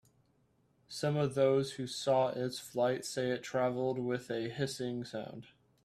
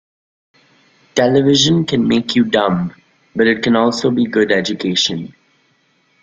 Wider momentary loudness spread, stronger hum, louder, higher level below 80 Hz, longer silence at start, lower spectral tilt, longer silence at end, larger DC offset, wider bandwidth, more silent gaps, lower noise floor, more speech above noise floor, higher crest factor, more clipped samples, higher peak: about the same, 11 LU vs 10 LU; neither; second, -34 LUFS vs -15 LUFS; second, -74 dBFS vs -52 dBFS; second, 0.9 s vs 1.15 s; about the same, -5.5 dB/octave vs -4.5 dB/octave; second, 0.4 s vs 0.95 s; neither; first, 14 kHz vs 7.8 kHz; neither; first, -72 dBFS vs -59 dBFS; second, 38 dB vs 44 dB; about the same, 18 dB vs 16 dB; neither; second, -16 dBFS vs 0 dBFS